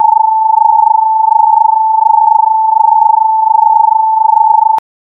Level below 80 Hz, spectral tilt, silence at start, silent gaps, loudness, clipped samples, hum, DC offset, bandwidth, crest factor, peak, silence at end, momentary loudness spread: -68 dBFS; -2.5 dB/octave; 0 s; none; -8 LUFS; 0.5%; none; under 0.1%; 1.9 kHz; 8 dB; 0 dBFS; 0.25 s; 2 LU